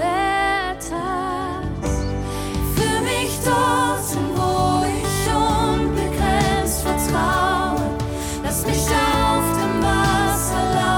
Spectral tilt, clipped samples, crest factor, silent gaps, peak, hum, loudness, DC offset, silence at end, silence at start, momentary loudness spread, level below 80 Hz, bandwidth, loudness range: -4.5 dB/octave; under 0.1%; 12 dB; none; -8 dBFS; none; -20 LUFS; under 0.1%; 0 s; 0 s; 7 LU; -30 dBFS; 19 kHz; 2 LU